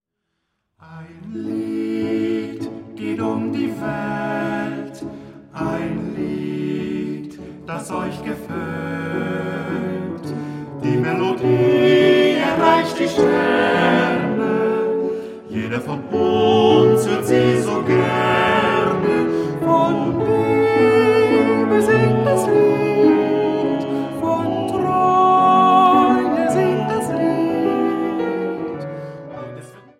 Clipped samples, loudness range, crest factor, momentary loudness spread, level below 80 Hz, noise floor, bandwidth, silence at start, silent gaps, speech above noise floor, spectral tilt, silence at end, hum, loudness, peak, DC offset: under 0.1%; 10 LU; 16 dB; 15 LU; -54 dBFS; -75 dBFS; 15 kHz; 0.85 s; none; 50 dB; -6.5 dB/octave; 0.2 s; none; -18 LUFS; -2 dBFS; under 0.1%